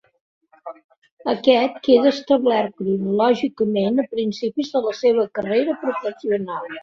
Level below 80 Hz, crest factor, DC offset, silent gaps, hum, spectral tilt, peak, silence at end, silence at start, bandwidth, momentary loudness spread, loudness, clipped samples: -64 dBFS; 18 dB; under 0.1%; 0.84-0.89 s, 0.98-1.02 s, 1.12-1.17 s; none; -6.5 dB/octave; -2 dBFS; 0 s; 0.65 s; 7 kHz; 10 LU; -20 LUFS; under 0.1%